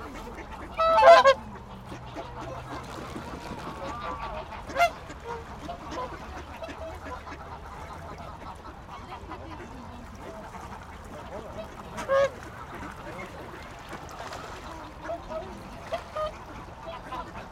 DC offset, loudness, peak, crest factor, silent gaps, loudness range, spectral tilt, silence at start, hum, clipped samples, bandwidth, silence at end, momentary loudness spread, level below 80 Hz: under 0.1%; -28 LUFS; -4 dBFS; 26 dB; none; 18 LU; -4.5 dB/octave; 0 s; none; under 0.1%; 15 kHz; 0 s; 17 LU; -48 dBFS